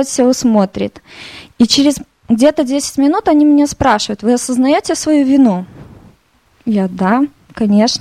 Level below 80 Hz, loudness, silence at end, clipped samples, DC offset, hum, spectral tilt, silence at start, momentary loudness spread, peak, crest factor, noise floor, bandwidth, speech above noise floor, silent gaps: -44 dBFS; -13 LUFS; 0 s; under 0.1%; under 0.1%; none; -4.5 dB/octave; 0 s; 13 LU; 0 dBFS; 12 dB; -53 dBFS; 14.5 kHz; 41 dB; none